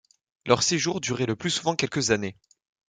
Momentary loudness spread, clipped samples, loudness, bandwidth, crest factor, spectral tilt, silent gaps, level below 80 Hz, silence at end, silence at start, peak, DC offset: 6 LU; under 0.1%; -25 LUFS; 10.5 kHz; 24 dB; -3.5 dB/octave; none; -60 dBFS; 0.55 s; 0.45 s; -2 dBFS; under 0.1%